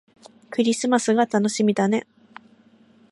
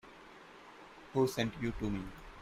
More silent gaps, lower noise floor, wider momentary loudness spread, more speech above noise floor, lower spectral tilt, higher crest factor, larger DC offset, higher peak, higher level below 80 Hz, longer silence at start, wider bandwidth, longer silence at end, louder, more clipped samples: neither; about the same, -55 dBFS vs -55 dBFS; second, 5 LU vs 21 LU; first, 35 dB vs 20 dB; second, -4.5 dB/octave vs -6 dB/octave; second, 16 dB vs 22 dB; neither; first, -6 dBFS vs -16 dBFS; second, -74 dBFS vs -54 dBFS; first, 0.5 s vs 0.05 s; second, 11.5 kHz vs 15.5 kHz; first, 1.1 s vs 0 s; first, -21 LUFS vs -36 LUFS; neither